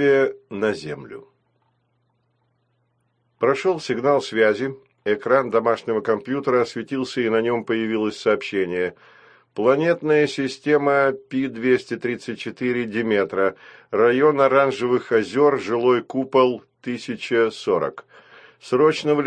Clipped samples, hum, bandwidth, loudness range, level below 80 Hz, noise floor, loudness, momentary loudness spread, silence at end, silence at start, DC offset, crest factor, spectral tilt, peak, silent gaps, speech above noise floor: under 0.1%; none; 9.6 kHz; 5 LU; -66 dBFS; -68 dBFS; -21 LUFS; 11 LU; 0 s; 0 s; under 0.1%; 18 dB; -6 dB/octave; -4 dBFS; none; 48 dB